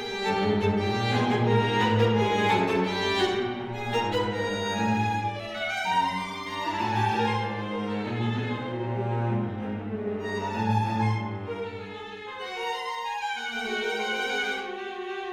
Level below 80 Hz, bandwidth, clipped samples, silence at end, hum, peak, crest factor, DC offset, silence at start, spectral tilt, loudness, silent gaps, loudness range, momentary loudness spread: -60 dBFS; 14 kHz; under 0.1%; 0 s; none; -10 dBFS; 18 dB; under 0.1%; 0 s; -6 dB/octave; -27 LUFS; none; 6 LU; 10 LU